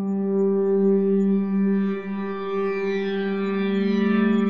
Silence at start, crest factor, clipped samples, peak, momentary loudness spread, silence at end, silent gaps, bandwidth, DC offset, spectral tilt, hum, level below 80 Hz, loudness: 0 s; 12 dB; under 0.1%; -10 dBFS; 6 LU; 0 s; none; 5.4 kHz; 0.5%; -9.5 dB/octave; none; -76 dBFS; -22 LUFS